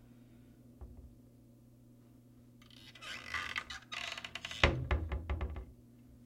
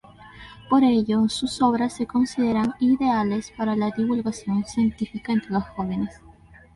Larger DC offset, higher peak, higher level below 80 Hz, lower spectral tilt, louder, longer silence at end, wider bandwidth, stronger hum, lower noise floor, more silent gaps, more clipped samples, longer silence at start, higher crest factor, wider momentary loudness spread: neither; about the same, -6 dBFS vs -6 dBFS; first, -46 dBFS vs -52 dBFS; second, -4.5 dB/octave vs -6 dB/octave; second, -38 LUFS vs -23 LUFS; second, 0 s vs 0.5 s; first, 15.5 kHz vs 11.5 kHz; neither; first, -61 dBFS vs -49 dBFS; neither; neither; second, 0 s vs 0.2 s; first, 36 dB vs 16 dB; first, 28 LU vs 8 LU